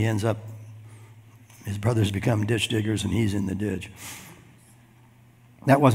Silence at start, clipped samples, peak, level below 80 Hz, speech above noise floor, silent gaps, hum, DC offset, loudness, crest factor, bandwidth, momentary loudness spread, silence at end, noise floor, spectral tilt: 0 s; under 0.1%; -4 dBFS; -58 dBFS; 30 dB; none; none; under 0.1%; -26 LUFS; 22 dB; 16 kHz; 19 LU; 0 s; -54 dBFS; -6 dB/octave